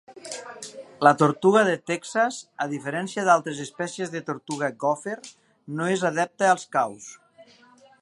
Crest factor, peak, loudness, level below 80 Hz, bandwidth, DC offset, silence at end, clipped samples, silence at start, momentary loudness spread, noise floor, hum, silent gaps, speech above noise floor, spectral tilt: 24 dB; -2 dBFS; -24 LUFS; -76 dBFS; 11.5 kHz; under 0.1%; 0.6 s; under 0.1%; 0.1 s; 18 LU; -55 dBFS; none; none; 31 dB; -4.5 dB/octave